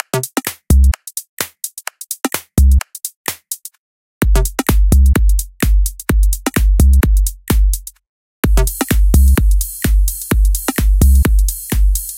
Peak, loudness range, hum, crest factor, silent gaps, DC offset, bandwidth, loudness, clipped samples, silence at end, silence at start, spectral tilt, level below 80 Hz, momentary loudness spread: 0 dBFS; 4 LU; none; 12 dB; 1.29-1.37 s, 3.16-3.24 s, 3.78-4.21 s, 8.09-8.43 s; under 0.1%; 17.5 kHz; -15 LUFS; under 0.1%; 0 s; 0.15 s; -5 dB/octave; -14 dBFS; 13 LU